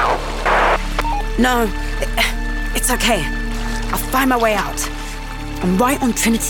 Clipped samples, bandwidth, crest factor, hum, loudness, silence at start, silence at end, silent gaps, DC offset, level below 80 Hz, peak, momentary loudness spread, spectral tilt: under 0.1%; 18 kHz; 14 dB; none; -18 LUFS; 0 s; 0 s; none; under 0.1%; -24 dBFS; -2 dBFS; 9 LU; -3.5 dB/octave